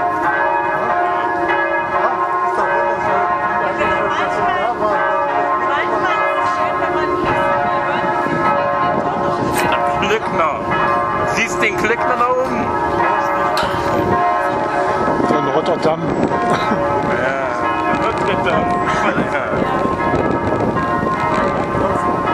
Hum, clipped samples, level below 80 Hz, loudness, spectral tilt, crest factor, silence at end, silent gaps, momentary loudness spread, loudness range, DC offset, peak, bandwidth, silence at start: none; under 0.1%; -42 dBFS; -16 LUFS; -5.5 dB/octave; 16 dB; 0 s; none; 2 LU; 1 LU; under 0.1%; 0 dBFS; 14.5 kHz; 0 s